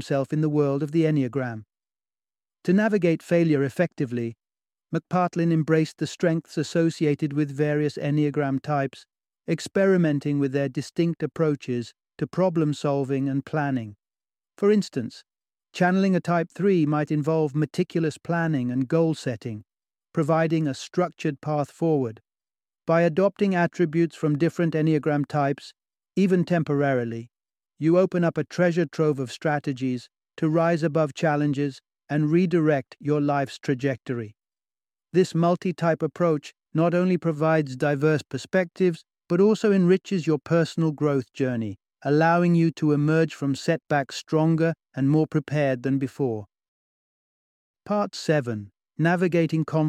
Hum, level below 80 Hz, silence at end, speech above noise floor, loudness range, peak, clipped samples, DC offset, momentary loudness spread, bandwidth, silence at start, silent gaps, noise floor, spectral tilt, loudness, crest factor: none; -68 dBFS; 0 s; over 67 dB; 3 LU; -6 dBFS; under 0.1%; under 0.1%; 9 LU; 11 kHz; 0 s; 46.68-47.74 s; under -90 dBFS; -7.5 dB/octave; -24 LUFS; 18 dB